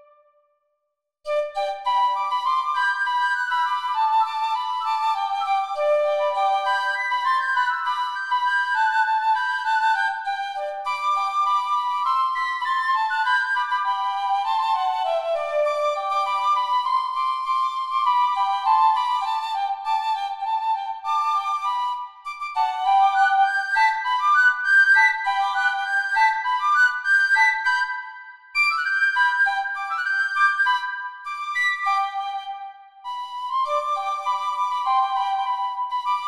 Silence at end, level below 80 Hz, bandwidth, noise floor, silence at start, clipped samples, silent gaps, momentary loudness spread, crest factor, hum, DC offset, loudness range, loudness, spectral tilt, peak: 0 s; -72 dBFS; 12.5 kHz; -78 dBFS; 1.25 s; under 0.1%; none; 9 LU; 16 dB; none; 0.1%; 6 LU; -21 LUFS; 2.5 dB/octave; -6 dBFS